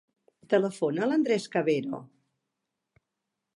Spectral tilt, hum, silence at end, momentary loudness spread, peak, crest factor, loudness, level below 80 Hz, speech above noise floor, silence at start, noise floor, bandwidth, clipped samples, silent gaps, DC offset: -6 dB/octave; none; 1.5 s; 7 LU; -10 dBFS; 20 dB; -27 LUFS; -82 dBFS; 58 dB; 0.5 s; -85 dBFS; 11.5 kHz; under 0.1%; none; under 0.1%